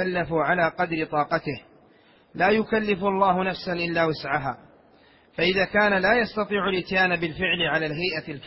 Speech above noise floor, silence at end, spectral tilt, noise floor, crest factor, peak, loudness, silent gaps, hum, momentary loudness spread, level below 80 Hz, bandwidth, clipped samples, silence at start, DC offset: 33 dB; 0 s; -9.5 dB/octave; -56 dBFS; 18 dB; -8 dBFS; -23 LUFS; none; none; 7 LU; -54 dBFS; 5.8 kHz; under 0.1%; 0 s; under 0.1%